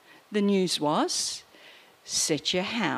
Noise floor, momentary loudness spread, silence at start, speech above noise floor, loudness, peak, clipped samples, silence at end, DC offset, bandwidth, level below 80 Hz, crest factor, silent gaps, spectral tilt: -53 dBFS; 7 LU; 0.3 s; 26 dB; -26 LUFS; -10 dBFS; under 0.1%; 0 s; under 0.1%; 15 kHz; -70 dBFS; 18 dB; none; -3 dB/octave